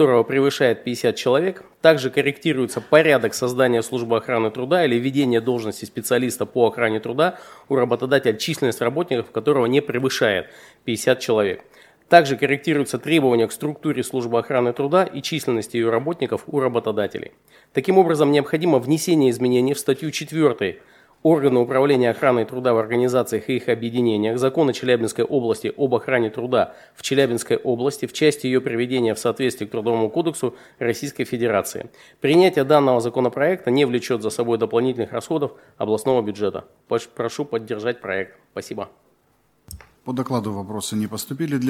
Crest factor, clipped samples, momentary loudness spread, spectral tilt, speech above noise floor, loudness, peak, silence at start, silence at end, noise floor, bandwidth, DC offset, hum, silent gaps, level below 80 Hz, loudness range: 20 dB; under 0.1%; 10 LU; -5.5 dB/octave; 42 dB; -20 LUFS; 0 dBFS; 0 s; 0 s; -62 dBFS; 16.5 kHz; under 0.1%; none; none; -62 dBFS; 5 LU